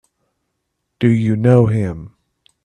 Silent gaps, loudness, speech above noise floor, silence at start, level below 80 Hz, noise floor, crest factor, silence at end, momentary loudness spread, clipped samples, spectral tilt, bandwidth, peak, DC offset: none; -15 LUFS; 59 dB; 1 s; -48 dBFS; -73 dBFS; 18 dB; 0.6 s; 12 LU; under 0.1%; -9.5 dB/octave; 9.4 kHz; 0 dBFS; under 0.1%